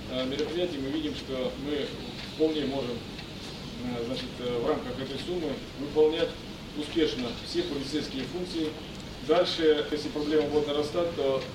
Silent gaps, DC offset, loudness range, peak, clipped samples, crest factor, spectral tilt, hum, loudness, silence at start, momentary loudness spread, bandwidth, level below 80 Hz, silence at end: none; under 0.1%; 4 LU; -12 dBFS; under 0.1%; 18 dB; -5.5 dB/octave; none; -30 LUFS; 0 s; 12 LU; 16 kHz; -50 dBFS; 0 s